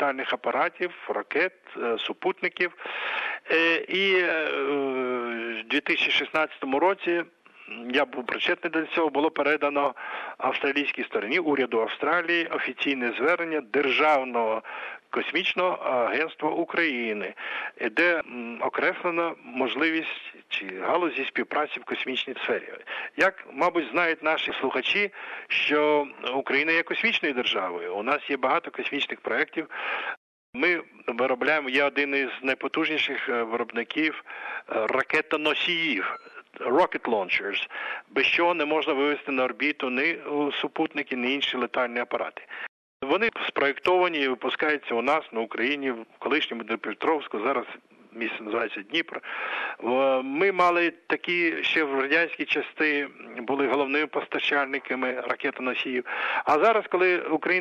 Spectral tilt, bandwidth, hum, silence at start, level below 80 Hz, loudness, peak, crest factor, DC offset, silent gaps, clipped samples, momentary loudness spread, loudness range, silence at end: -4.5 dB/octave; 9.2 kHz; none; 0 s; -76 dBFS; -26 LUFS; -10 dBFS; 16 dB; under 0.1%; 30.17-30.53 s, 42.69-43.00 s; under 0.1%; 9 LU; 3 LU; 0 s